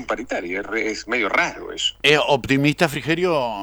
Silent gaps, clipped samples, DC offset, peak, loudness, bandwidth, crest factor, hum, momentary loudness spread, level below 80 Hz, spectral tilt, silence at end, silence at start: none; under 0.1%; under 0.1%; 0 dBFS; -20 LUFS; 20 kHz; 20 dB; none; 9 LU; -48 dBFS; -4 dB/octave; 0 s; 0 s